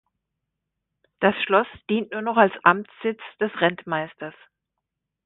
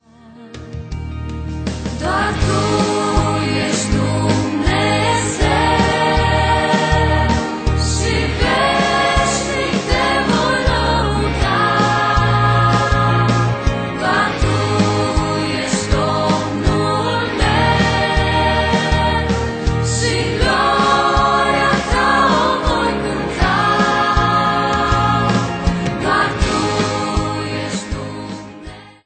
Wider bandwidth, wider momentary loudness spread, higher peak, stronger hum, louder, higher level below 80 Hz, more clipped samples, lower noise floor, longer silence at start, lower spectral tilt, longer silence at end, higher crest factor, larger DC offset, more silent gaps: second, 4.1 kHz vs 9.2 kHz; first, 11 LU vs 8 LU; about the same, 0 dBFS vs -2 dBFS; neither; second, -22 LUFS vs -16 LUFS; second, -66 dBFS vs -26 dBFS; neither; first, -82 dBFS vs -40 dBFS; first, 1.2 s vs 0.25 s; first, -9.5 dB/octave vs -5 dB/octave; first, 0.95 s vs 0.15 s; first, 24 dB vs 14 dB; neither; neither